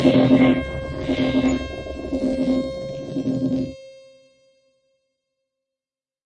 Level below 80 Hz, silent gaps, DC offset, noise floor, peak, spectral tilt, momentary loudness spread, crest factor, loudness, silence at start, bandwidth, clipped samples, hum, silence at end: -42 dBFS; none; under 0.1%; under -90 dBFS; -2 dBFS; -7 dB/octave; 15 LU; 20 dB; -22 LUFS; 0 s; 8.6 kHz; under 0.1%; none; 2.25 s